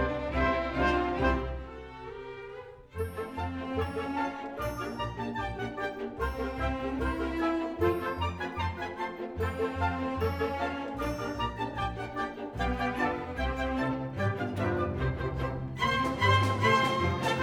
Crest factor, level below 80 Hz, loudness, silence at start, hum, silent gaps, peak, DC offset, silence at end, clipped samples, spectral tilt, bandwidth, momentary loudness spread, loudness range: 20 dB; -42 dBFS; -31 LUFS; 0 s; none; none; -12 dBFS; under 0.1%; 0 s; under 0.1%; -6 dB/octave; over 20 kHz; 9 LU; 6 LU